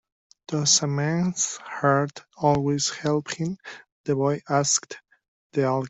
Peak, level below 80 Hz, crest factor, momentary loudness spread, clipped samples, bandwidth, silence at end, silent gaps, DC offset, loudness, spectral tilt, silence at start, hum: -6 dBFS; -60 dBFS; 20 dB; 12 LU; under 0.1%; 8.2 kHz; 0 s; 3.92-4.04 s, 5.28-5.50 s; under 0.1%; -24 LUFS; -4 dB/octave; 0.5 s; none